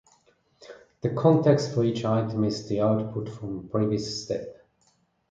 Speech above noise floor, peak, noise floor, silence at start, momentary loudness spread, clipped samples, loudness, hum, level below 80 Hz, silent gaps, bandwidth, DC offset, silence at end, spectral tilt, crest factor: 43 dB; -8 dBFS; -67 dBFS; 0.6 s; 13 LU; under 0.1%; -26 LUFS; none; -60 dBFS; none; 9 kHz; under 0.1%; 0.75 s; -7 dB/octave; 20 dB